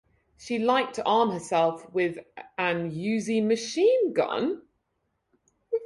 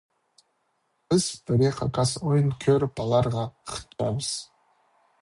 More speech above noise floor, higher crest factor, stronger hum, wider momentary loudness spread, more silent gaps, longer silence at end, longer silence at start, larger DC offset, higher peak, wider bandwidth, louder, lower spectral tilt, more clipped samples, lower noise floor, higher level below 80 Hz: about the same, 51 dB vs 48 dB; about the same, 18 dB vs 16 dB; neither; about the same, 10 LU vs 9 LU; neither; second, 0 s vs 0.8 s; second, 0.4 s vs 1.1 s; neither; about the same, -10 dBFS vs -10 dBFS; about the same, 11.5 kHz vs 11.5 kHz; about the same, -26 LUFS vs -25 LUFS; about the same, -5 dB/octave vs -6 dB/octave; neither; first, -77 dBFS vs -73 dBFS; second, -70 dBFS vs -52 dBFS